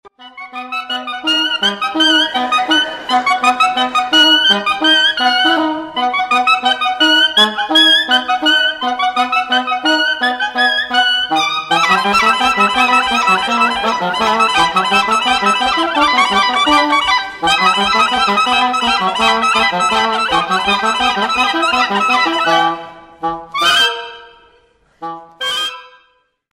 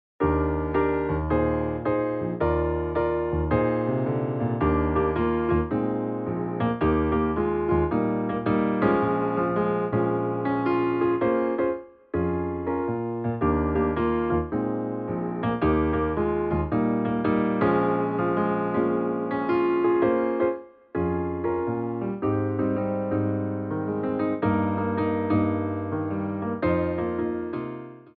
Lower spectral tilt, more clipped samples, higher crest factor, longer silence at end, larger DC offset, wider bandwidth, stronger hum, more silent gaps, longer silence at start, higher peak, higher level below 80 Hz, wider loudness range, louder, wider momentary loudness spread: second, -2 dB/octave vs -8 dB/octave; neither; about the same, 14 dB vs 16 dB; first, 0.65 s vs 0.1 s; neither; first, 16 kHz vs 4.6 kHz; neither; neither; second, 0.05 s vs 0.2 s; first, 0 dBFS vs -8 dBFS; second, -48 dBFS vs -40 dBFS; about the same, 3 LU vs 2 LU; first, -12 LUFS vs -25 LUFS; about the same, 8 LU vs 6 LU